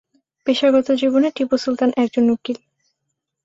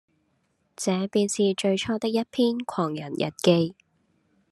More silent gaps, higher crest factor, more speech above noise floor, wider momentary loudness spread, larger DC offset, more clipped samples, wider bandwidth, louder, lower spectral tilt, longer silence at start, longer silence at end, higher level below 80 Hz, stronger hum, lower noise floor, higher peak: neither; about the same, 16 dB vs 20 dB; first, 60 dB vs 46 dB; about the same, 10 LU vs 8 LU; neither; neither; second, 7.8 kHz vs 13 kHz; first, -18 LUFS vs -25 LUFS; about the same, -5 dB/octave vs -5 dB/octave; second, 0.45 s vs 0.8 s; about the same, 0.9 s vs 0.8 s; first, -62 dBFS vs -68 dBFS; neither; first, -77 dBFS vs -71 dBFS; about the same, -4 dBFS vs -6 dBFS